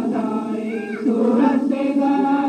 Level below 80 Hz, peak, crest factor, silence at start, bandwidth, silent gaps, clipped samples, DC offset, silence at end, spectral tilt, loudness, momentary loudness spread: -72 dBFS; -4 dBFS; 14 dB; 0 s; 9 kHz; none; under 0.1%; under 0.1%; 0 s; -7.5 dB/octave; -20 LUFS; 8 LU